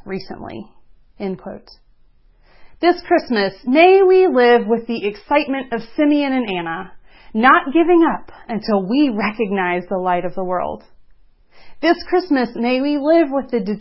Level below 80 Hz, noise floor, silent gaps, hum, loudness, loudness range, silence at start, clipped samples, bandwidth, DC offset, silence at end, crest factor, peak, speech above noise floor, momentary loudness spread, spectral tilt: -52 dBFS; -51 dBFS; none; none; -17 LUFS; 6 LU; 0.05 s; under 0.1%; 5.8 kHz; under 0.1%; 0 s; 18 dB; 0 dBFS; 34 dB; 17 LU; -10 dB/octave